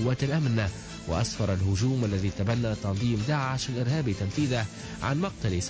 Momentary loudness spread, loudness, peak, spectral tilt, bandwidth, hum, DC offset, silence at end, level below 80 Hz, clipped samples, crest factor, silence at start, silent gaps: 4 LU; -28 LUFS; -16 dBFS; -6 dB/octave; 8 kHz; none; under 0.1%; 0 s; -42 dBFS; under 0.1%; 12 dB; 0 s; none